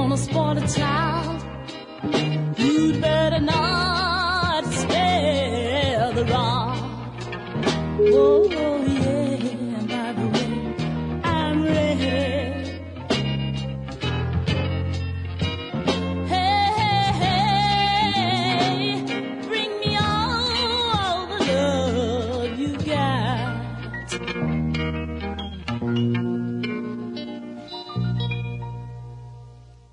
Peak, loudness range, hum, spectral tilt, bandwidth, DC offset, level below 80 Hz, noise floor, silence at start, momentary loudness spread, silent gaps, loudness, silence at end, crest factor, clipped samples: -6 dBFS; 6 LU; none; -5.5 dB/octave; 11 kHz; under 0.1%; -44 dBFS; -45 dBFS; 0 s; 12 LU; none; -23 LUFS; 0.3 s; 16 dB; under 0.1%